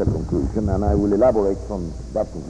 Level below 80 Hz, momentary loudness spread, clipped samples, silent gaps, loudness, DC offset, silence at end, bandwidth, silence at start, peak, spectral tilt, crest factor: -30 dBFS; 11 LU; under 0.1%; none; -21 LUFS; under 0.1%; 0 s; 10.5 kHz; 0 s; -6 dBFS; -9 dB/octave; 14 dB